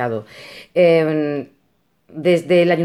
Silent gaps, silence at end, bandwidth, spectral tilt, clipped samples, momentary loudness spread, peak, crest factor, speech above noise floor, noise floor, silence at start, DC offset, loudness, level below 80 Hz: none; 0 s; 12 kHz; -7 dB/octave; under 0.1%; 23 LU; -4 dBFS; 14 dB; 47 dB; -64 dBFS; 0 s; under 0.1%; -17 LUFS; -66 dBFS